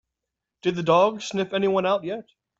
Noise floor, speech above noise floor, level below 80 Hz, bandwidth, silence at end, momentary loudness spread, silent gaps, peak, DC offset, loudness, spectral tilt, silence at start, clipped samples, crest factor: -85 dBFS; 62 dB; -66 dBFS; 8 kHz; 0.4 s; 10 LU; none; -6 dBFS; under 0.1%; -23 LUFS; -5.5 dB/octave; 0.65 s; under 0.1%; 18 dB